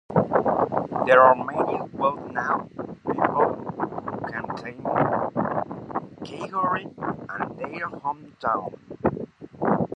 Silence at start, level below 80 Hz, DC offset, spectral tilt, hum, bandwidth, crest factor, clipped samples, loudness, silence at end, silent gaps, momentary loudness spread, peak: 0.1 s; -56 dBFS; under 0.1%; -8 dB/octave; none; 8.4 kHz; 22 dB; under 0.1%; -25 LUFS; 0 s; none; 12 LU; -2 dBFS